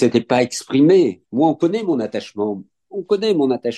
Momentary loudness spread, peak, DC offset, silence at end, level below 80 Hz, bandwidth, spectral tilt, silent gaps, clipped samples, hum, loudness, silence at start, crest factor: 12 LU; -2 dBFS; under 0.1%; 0 s; -66 dBFS; 12.5 kHz; -6 dB/octave; none; under 0.1%; none; -18 LUFS; 0 s; 16 dB